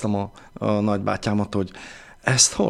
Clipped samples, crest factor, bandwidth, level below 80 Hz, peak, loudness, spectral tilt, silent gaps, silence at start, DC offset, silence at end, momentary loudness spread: under 0.1%; 22 dB; 14.5 kHz; -50 dBFS; -2 dBFS; -23 LUFS; -3.5 dB/octave; none; 0 s; under 0.1%; 0 s; 17 LU